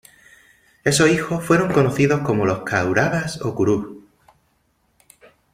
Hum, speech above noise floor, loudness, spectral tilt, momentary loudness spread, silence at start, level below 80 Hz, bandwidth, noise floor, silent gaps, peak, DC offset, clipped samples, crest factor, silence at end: none; 46 dB; -19 LUFS; -5.5 dB/octave; 8 LU; 0.85 s; -52 dBFS; 16 kHz; -65 dBFS; none; -2 dBFS; under 0.1%; under 0.1%; 18 dB; 1.55 s